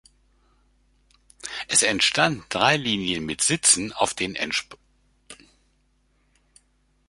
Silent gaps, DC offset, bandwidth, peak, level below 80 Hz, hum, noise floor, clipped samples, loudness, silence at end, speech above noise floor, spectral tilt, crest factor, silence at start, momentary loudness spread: none; under 0.1%; 11.5 kHz; -2 dBFS; -56 dBFS; none; -66 dBFS; under 0.1%; -21 LUFS; 1.75 s; 43 dB; -1.5 dB/octave; 24 dB; 1.45 s; 10 LU